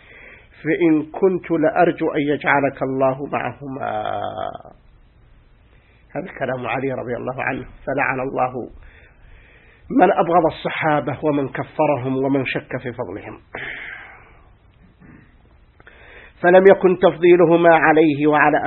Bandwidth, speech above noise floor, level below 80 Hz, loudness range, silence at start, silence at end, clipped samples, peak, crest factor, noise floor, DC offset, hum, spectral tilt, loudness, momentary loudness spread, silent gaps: 4.2 kHz; 34 dB; -50 dBFS; 13 LU; 0.25 s; 0 s; under 0.1%; 0 dBFS; 20 dB; -51 dBFS; under 0.1%; none; -10.5 dB/octave; -18 LUFS; 18 LU; none